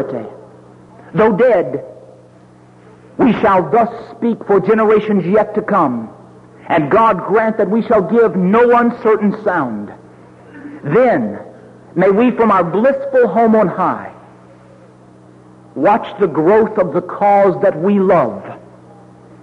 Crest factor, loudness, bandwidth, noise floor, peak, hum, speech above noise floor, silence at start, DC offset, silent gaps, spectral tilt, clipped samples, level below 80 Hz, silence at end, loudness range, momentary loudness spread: 12 dB; -13 LUFS; 6.2 kHz; -43 dBFS; -2 dBFS; none; 30 dB; 0 s; under 0.1%; none; -9 dB/octave; under 0.1%; -52 dBFS; 0.85 s; 4 LU; 15 LU